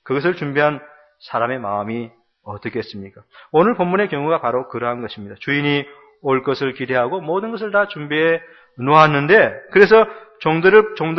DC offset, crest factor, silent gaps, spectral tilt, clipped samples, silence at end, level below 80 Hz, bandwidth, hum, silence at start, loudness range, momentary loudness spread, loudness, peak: under 0.1%; 18 dB; none; -7.5 dB/octave; under 0.1%; 0 s; -58 dBFS; 6.2 kHz; none; 0.05 s; 8 LU; 16 LU; -17 LUFS; 0 dBFS